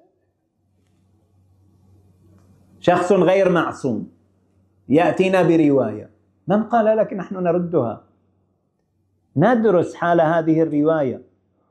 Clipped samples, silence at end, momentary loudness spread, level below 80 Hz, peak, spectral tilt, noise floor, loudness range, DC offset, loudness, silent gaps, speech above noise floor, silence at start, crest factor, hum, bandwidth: under 0.1%; 0.5 s; 12 LU; -64 dBFS; -2 dBFS; -7.5 dB/octave; -67 dBFS; 4 LU; under 0.1%; -18 LUFS; none; 50 dB; 2.85 s; 18 dB; none; 9.6 kHz